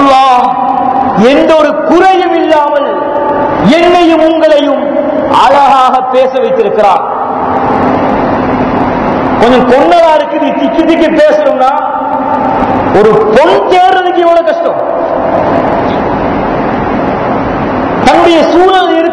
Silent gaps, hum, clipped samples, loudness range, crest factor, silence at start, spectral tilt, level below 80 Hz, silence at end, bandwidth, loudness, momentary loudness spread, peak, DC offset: none; none; 6%; 3 LU; 6 dB; 0 s; -6 dB/octave; -34 dBFS; 0 s; 11 kHz; -7 LUFS; 6 LU; 0 dBFS; under 0.1%